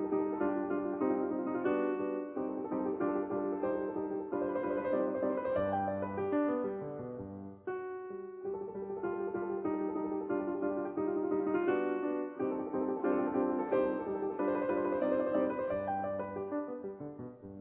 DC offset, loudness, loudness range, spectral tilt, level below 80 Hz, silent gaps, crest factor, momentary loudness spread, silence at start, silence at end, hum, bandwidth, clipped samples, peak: under 0.1%; -35 LUFS; 5 LU; -7.5 dB/octave; -68 dBFS; none; 16 dB; 10 LU; 0 s; 0 s; none; 4 kHz; under 0.1%; -18 dBFS